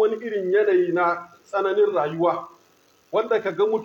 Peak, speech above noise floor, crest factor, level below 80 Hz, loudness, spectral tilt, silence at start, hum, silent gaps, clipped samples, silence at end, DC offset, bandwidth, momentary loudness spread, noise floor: -8 dBFS; 37 dB; 14 dB; -76 dBFS; -22 LUFS; -7 dB/octave; 0 s; none; none; under 0.1%; 0 s; under 0.1%; 7.6 kHz; 8 LU; -59 dBFS